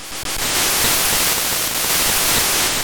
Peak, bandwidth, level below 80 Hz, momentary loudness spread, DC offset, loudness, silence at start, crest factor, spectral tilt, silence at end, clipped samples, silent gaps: -6 dBFS; over 20 kHz; -38 dBFS; 4 LU; under 0.1%; -15 LUFS; 0 s; 12 dB; -0.5 dB/octave; 0 s; under 0.1%; none